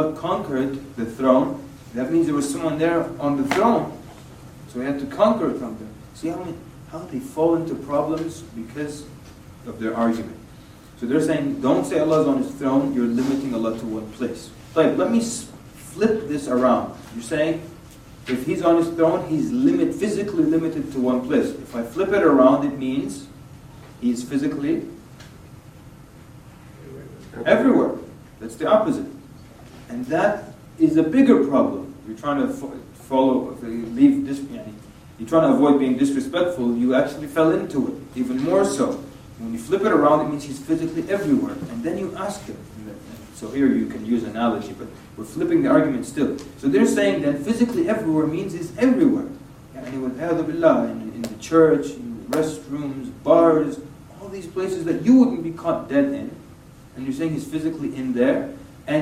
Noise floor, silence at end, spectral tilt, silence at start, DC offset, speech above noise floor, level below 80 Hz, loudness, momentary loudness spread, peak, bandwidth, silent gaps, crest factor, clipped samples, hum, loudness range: -45 dBFS; 0 s; -6.5 dB/octave; 0 s; under 0.1%; 24 dB; -52 dBFS; -21 LUFS; 19 LU; -2 dBFS; 14.5 kHz; none; 20 dB; under 0.1%; none; 6 LU